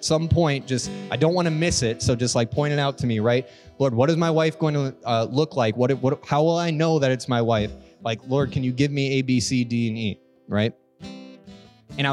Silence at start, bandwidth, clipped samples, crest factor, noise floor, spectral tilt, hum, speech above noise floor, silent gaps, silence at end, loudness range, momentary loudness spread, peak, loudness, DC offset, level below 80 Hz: 0 s; 12 kHz; under 0.1%; 16 dB; -47 dBFS; -5.5 dB/octave; none; 25 dB; none; 0 s; 3 LU; 9 LU; -6 dBFS; -23 LUFS; under 0.1%; -50 dBFS